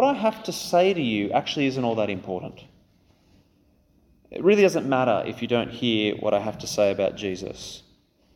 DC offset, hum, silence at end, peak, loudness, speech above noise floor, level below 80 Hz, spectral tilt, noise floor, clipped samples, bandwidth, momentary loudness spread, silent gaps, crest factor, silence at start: under 0.1%; none; 0.55 s; -6 dBFS; -24 LUFS; 38 dB; -60 dBFS; -5 dB/octave; -62 dBFS; under 0.1%; 18 kHz; 13 LU; none; 18 dB; 0 s